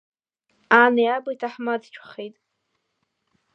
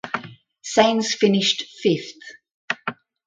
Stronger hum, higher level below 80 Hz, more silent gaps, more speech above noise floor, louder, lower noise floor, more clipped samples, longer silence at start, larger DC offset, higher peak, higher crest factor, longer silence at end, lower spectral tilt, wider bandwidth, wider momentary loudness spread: neither; second, -82 dBFS vs -64 dBFS; second, none vs 2.51-2.68 s; first, 54 dB vs 21 dB; about the same, -20 LUFS vs -21 LUFS; first, -75 dBFS vs -41 dBFS; neither; first, 0.7 s vs 0.05 s; neither; about the same, -2 dBFS vs -2 dBFS; about the same, 22 dB vs 20 dB; first, 1.25 s vs 0.35 s; first, -5.5 dB/octave vs -4 dB/octave; second, 6.6 kHz vs 9.4 kHz; first, 22 LU vs 17 LU